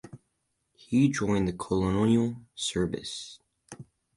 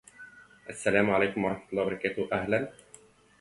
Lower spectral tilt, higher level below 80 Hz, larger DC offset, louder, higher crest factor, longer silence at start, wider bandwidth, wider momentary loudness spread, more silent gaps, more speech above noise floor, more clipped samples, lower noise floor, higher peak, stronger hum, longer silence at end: about the same, -5.5 dB/octave vs -5.5 dB/octave; first, -50 dBFS vs -62 dBFS; neither; about the same, -28 LUFS vs -29 LUFS; about the same, 18 dB vs 22 dB; second, 0.05 s vs 0.2 s; about the same, 11.5 kHz vs 11.5 kHz; about the same, 21 LU vs 23 LU; neither; first, 51 dB vs 28 dB; neither; first, -78 dBFS vs -57 dBFS; second, -12 dBFS vs -8 dBFS; second, none vs 50 Hz at -60 dBFS; second, 0.35 s vs 0.7 s